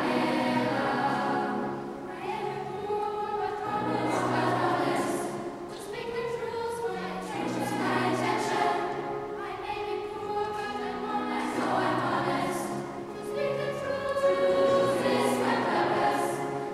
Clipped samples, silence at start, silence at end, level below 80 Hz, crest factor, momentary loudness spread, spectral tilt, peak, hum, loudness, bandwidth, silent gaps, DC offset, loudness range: under 0.1%; 0 s; 0 s; -62 dBFS; 16 dB; 9 LU; -5 dB/octave; -14 dBFS; none; -29 LUFS; 15 kHz; none; under 0.1%; 5 LU